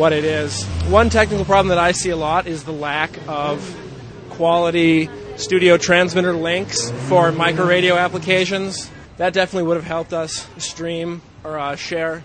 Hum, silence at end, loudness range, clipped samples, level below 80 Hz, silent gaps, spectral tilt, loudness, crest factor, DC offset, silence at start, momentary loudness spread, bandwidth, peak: none; 0 s; 5 LU; under 0.1%; -38 dBFS; none; -4.5 dB/octave; -18 LUFS; 18 dB; under 0.1%; 0 s; 13 LU; 9.4 kHz; 0 dBFS